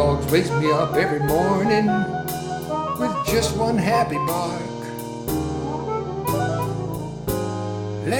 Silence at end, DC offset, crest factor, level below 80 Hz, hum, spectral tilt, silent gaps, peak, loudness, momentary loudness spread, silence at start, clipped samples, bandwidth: 0 s; under 0.1%; 18 dB; -40 dBFS; none; -5.5 dB/octave; none; -4 dBFS; -23 LUFS; 9 LU; 0 s; under 0.1%; 19 kHz